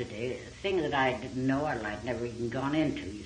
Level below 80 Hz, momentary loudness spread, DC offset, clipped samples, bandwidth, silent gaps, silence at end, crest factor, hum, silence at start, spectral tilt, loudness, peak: -54 dBFS; 7 LU; under 0.1%; under 0.1%; 10 kHz; none; 0 s; 18 dB; none; 0 s; -6 dB/octave; -32 LUFS; -14 dBFS